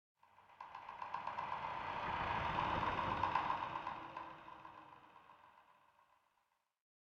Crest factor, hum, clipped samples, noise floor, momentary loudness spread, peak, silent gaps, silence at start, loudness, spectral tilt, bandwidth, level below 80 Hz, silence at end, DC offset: 24 dB; none; under 0.1%; -83 dBFS; 20 LU; -22 dBFS; none; 0.4 s; -42 LUFS; -5.5 dB/octave; 8 kHz; -64 dBFS; 1.4 s; under 0.1%